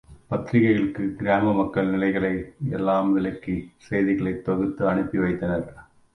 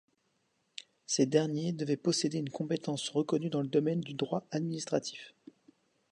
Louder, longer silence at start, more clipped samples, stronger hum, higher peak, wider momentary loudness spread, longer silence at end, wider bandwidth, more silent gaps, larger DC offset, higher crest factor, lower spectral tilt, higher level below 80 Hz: first, -24 LUFS vs -33 LUFS; second, 0.1 s vs 1.1 s; neither; neither; first, -8 dBFS vs -14 dBFS; second, 9 LU vs 18 LU; second, 0.3 s vs 0.8 s; second, 9.4 kHz vs 11 kHz; neither; neither; about the same, 16 dB vs 20 dB; first, -9 dB/octave vs -5 dB/octave; first, -50 dBFS vs -78 dBFS